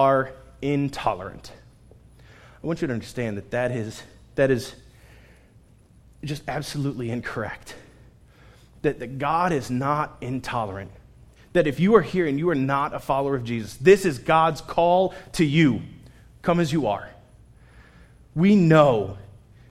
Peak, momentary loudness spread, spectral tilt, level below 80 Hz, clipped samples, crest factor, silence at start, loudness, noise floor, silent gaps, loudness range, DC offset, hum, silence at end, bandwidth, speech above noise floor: -2 dBFS; 16 LU; -6.5 dB/octave; -50 dBFS; under 0.1%; 22 dB; 0 s; -23 LUFS; -54 dBFS; none; 10 LU; under 0.1%; none; 0.45 s; 15 kHz; 31 dB